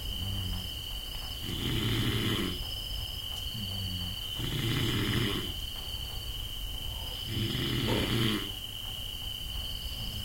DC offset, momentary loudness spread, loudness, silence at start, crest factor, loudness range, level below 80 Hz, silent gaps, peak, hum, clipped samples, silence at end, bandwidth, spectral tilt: under 0.1%; 8 LU; -33 LUFS; 0 s; 16 dB; 1 LU; -42 dBFS; none; -16 dBFS; none; under 0.1%; 0 s; 16.5 kHz; -4.5 dB/octave